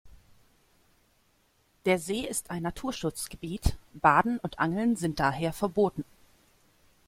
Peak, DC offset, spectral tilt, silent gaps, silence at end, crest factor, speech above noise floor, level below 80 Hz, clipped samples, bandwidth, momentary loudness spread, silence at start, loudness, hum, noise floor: -6 dBFS; under 0.1%; -5 dB/octave; none; 1.05 s; 24 dB; 40 dB; -44 dBFS; under 0.1%; 16.5 kHz; 11 LU; 0.05 s; -29 LUFS; none; -68 dBFS